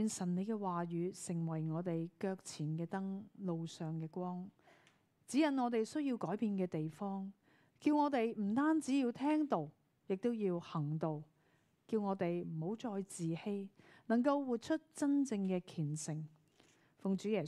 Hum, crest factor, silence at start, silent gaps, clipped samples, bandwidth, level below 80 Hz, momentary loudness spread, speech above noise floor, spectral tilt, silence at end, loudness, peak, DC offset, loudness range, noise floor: none; 18 dB; 0 s; none; under 0.1%; 12.5 kHz; -86 dBFS; 10 LU; 37 dB; -6.5 dB/octave; 0 s; -39 LUFS; -20 dBFS; under 0.1%; 5 LU; -75 dBFS